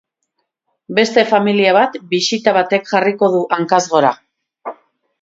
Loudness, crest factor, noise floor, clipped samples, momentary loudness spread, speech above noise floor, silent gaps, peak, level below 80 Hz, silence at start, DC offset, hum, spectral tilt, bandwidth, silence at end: -14 LUFS; 16 dB; -71 dBFS; under 0.1%; 19 LU; 58 dB; none; 0 dBFS; -66 dBFS; 0.9 s; under 0.1%; none; -4 dB/octave; 7.8 kHz; 0.5 s